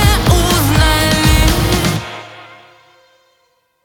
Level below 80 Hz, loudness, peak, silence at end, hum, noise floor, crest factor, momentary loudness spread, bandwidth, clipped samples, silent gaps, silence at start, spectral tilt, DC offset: -20 dBFS; -12 LUFS; 0 dBFS; 1.4 s; none; -60 dBFS; 14 dB; 16 LU; 19.5 kHz; under 0.1%; none; 0 s; -4.5 dB/octave; under 0.1%